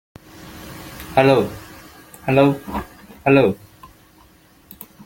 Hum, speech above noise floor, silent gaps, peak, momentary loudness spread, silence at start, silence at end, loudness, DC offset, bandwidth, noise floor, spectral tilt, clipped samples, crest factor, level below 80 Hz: none; 35 dB; none; -2 dBFS; 25 LU; 0.4 s; 1.5 s; -18 LUFS; under 0.1%; 17 kHz; -51 dBFS; -7 dB/octave; under 0.1%; 20 dB; -48 dBFS